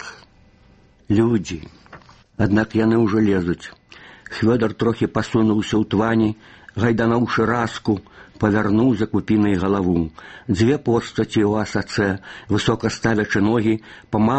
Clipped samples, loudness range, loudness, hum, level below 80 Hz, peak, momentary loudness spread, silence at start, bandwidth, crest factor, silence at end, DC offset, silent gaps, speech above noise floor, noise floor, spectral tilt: under 0.1%; 1 LU; -20 LUFS; none; -46 dBFS; -2 dBFS; 10 LU; 0 s; 8.4 kHz; 18 dB; 0 s; under 0.1%; none; 33 dB; -52 dBFS; -7 dB/octave